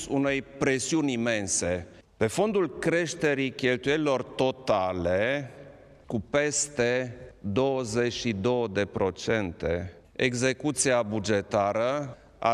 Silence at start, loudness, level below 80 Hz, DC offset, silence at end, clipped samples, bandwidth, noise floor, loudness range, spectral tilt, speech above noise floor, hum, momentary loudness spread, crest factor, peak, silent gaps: 0 s; -27 LUFS; -54 dBFS; under 0.1%; 0 s; under 0.1%; 13.5 kHz; -50 dBFS; 2 LU; -4 dB/octave; 23 dB; none; 6 LU; 18 dB; -10 dBFS; none